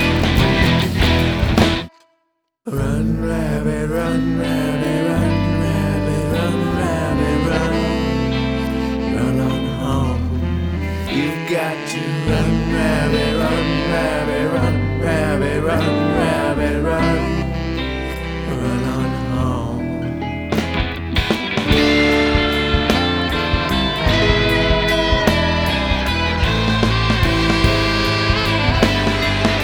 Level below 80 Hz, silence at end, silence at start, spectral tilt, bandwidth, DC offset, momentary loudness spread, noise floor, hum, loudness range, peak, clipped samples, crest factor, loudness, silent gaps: -26 dBFS; 0 s; 0 s; -6 dB/octave; over 20 kHz; under 0.1%; 7 LU; -69 dBFS; none; 4 LU; 0 dBFS; under 0.1%; 18 dB; -18 LUFS; none